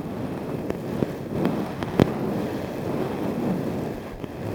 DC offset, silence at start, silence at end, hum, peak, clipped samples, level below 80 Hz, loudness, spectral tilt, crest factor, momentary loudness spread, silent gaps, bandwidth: under 0.1%; 0 s; 0 s; none; 0 dBFS; under 0.1%; -48 dBFS; -27 LUFS; -7.5 dB/octave; 26 dB; 8 LU; none; over 20 kHz